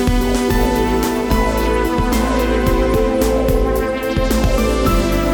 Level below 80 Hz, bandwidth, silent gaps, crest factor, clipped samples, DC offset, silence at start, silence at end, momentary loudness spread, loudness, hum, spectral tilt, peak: -20 dBFS; over 20 kHz; none; 12 dB; under 0.1%; under 0.1%; 0 s; 0 s; 2 LU; -16 LUFS; none; -5.5 dB/octave; -2 dBFS